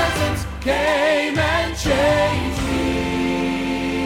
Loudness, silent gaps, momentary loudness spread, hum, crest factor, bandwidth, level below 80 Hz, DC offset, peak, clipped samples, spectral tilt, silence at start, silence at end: -20 LUFS; none; 5 LU; none; 12 dB; 17.5 kHz; -32 dBFS; under 0.1%; -6 dBFS; under 0.1%; -5 dB/octave; 0 s; 0 s